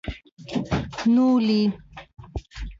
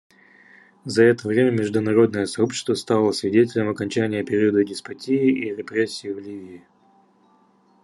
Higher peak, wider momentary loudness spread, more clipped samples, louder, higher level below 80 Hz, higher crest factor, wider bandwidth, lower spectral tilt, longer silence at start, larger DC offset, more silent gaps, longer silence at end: second, -12 dBFS vs -4 dBFS; first, 20 LU vs 13 LU; neither; about the same, -22 LUFS vs -21 LUFS; first, -40 dBFS vs -68 dBFS; second, 12 dB vs 18 dB; second, 7.6 kHz vs 12 kHz; about the same, -7 dB/octave vs -6 dB/octave; second, 0.05 s vs 0.85 s; neither; first, 0.32-0.37 s vs none; second, 0.05 s vs 1.25 s